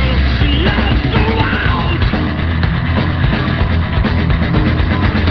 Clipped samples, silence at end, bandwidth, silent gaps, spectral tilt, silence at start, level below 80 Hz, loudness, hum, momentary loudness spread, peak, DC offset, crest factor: under 0.1%; 0 s; 6 kHz; none; -8.5 dB/octave; 0 s; -18 dBFS; -14 LUFS; none; 2 LU; 0 dBFS; 0.8%; 12 dB